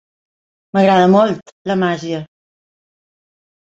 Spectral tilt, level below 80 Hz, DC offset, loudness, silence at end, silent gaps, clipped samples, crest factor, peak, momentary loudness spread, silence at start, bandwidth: -7 dB/octave; -60 dBFS; under 0.1%; -15 LUFS; 1.55 s; 1.52-1.65 s; under 0.1%; 16 dB; -2 dBFS; 15 LU; 0.75 s; 7.8 kHz